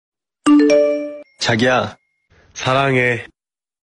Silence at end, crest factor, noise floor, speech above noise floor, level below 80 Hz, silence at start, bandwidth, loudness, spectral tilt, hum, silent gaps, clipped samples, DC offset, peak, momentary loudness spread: 0.65 s; 14 dB; -55 dBFS; 40 dB; -54 dBFS; 0.45 s; 10 kHz; -16 LUFS; -5 dB/octave; none; none; under 0.1%; under 0.1%; -4 dBFS; 14 LU